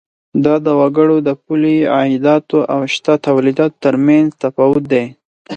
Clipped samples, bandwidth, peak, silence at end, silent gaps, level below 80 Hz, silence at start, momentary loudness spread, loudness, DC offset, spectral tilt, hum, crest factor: under 0.1%; 8.4 kHz; 0 dBFS; 0 s; 5.25-5.45 s; -56 dBFS; 0.35 s; 5 LU; -13 LUFS; under 0.1%; -7 dB/octave; none; 12 dB